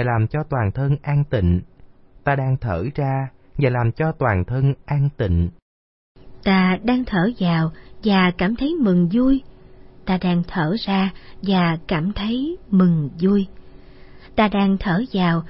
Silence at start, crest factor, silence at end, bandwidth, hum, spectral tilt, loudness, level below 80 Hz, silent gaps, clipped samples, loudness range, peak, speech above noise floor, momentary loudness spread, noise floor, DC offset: 0 s; 16 dB; 0 s; 5.8 kHz; none; -12 dB/octave; -20 LUFS; -38 dBFS; 5.62-6.15 s; under 0.1%; 3 LU; -4 dBFS; 27 dB; 7 LU; -46 dBFS; under 0.1%